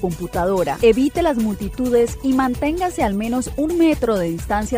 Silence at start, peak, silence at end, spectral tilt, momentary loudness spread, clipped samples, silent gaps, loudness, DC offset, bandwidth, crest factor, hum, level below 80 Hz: 0 s; -4 dBFS; 0 s; -6 dB/octave; 6 LU; under 0.1%; none; -19 LUFS; under 0.1%; 16 kHz; 16 dB; none; -34 dBFS